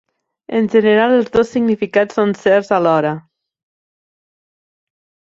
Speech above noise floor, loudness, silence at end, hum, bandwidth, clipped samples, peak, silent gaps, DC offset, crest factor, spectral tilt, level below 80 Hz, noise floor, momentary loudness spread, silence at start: over 76 dB; -15 LUFS; 2.1 s; none; 7.8 kHz; under 0.1%; -2 dBFS; none; under 0.1%; 16 dB; -6.5 dB/octave; -54 dBFS; under -90 dBFS; 7 LU; 0.5 s